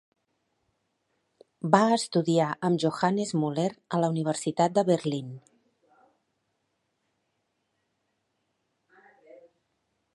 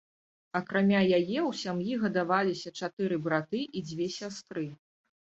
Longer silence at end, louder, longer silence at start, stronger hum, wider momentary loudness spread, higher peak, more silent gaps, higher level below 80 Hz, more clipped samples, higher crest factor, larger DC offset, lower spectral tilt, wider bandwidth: first, 4.75 s vs 0.65 s; first, -26 LUFS vs -30 LUFS; first, 1.65 s vs 0.55 s; neither; second, 10 LU vs 13 LU; first, -4 dBFS vs -12 dBFS; second, none vs 2.93-2.97 s; second, -76 dBFS vs -70 dBFS; neither; first, 26 dB vs 18 dB; neither; about the same, -6 dB/octave vs -6 dB/octave; first, 11.5 kHz vs 8 kHz